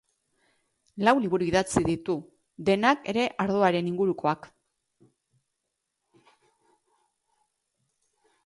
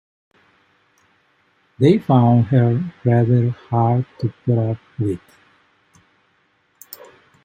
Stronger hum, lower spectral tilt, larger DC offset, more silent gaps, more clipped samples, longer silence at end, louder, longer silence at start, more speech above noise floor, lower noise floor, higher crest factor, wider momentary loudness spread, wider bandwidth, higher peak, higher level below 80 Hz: neither; second, -5.5 dB/octave vs -9.5 dB/octave; neither; neither; neither; first, 4 s vs 2.25 s; second, -26 LUFS vs -18 LUFS; second, 0.95 s vs 1.8 s; first, 57 dB vs 46 dB; first, -82 dBFS vs -62 dBFS; about the same, 22 dB vs 18 dB; second, 9 LU vs 17 LU; second, 11.5 kHz vs 16 kHz; second, -6 dBFS vs -2 dBFS; about the same, -56 dBFS vs -58 dBFS